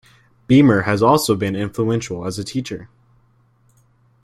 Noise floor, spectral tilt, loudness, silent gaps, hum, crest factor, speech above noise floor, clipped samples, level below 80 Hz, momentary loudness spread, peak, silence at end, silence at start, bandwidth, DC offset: -57 dBFS; -6 dB/octave; -17 LUFS; none; none; 18 dB; 40 dB; under 0.1%; -52 dBFS; 13 LU; -2 dBFS; 1.4 s; 0.5 s; 15.5 kHz; under 0.1%